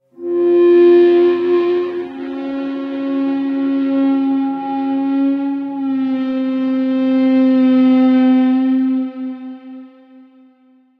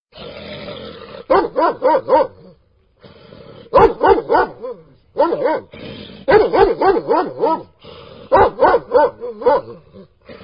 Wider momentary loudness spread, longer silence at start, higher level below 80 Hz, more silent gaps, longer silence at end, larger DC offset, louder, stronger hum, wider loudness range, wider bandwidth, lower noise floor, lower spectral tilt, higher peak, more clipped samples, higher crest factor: second, 13 LU vs 19 LU; about the same, 0.2 s vs 0.15 s; second, -70 dBFS vs -42 dBFS; neither; first, 1.1 s vs 0.1 s; second, under 0.1% vs 0.1%; about the same, -15 LUFS vs -15 LUFS; neither; about the same, 4 LU vs 4 LU; about the same, 5 kHz vs 5.4 kHz; about the same, -52 dBFS vs -55 dBFS; about the same, -8 dB/octave vs -8 dB/octave; second, -4 dBFS vs 0 dBFS; neither; about the same, 12 dB vs 16 dB